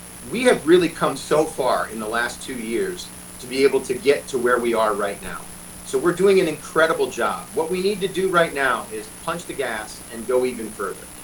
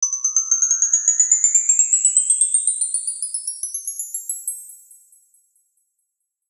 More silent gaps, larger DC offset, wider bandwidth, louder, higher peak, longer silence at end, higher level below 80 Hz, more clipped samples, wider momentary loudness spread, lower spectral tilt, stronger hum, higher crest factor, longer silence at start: neither; neither; first, 19 kHz vs 14.5 kHz; second, -21 LUFS vs -16 LUFS; about the same, -4 dBFS vs -2 dBFS; second, 0 s vs 1.75 s; first, -50 dBFS vs under -90 dBFS; neither; about the same, 13 LU vs 13 LU; first, -4 dB/octave vs 11.5 dB/octave; first, 60 Hz at -45 dBFS vs none; about the same, 18 dB vs 18 dB; about the same, 0 s vs 0 s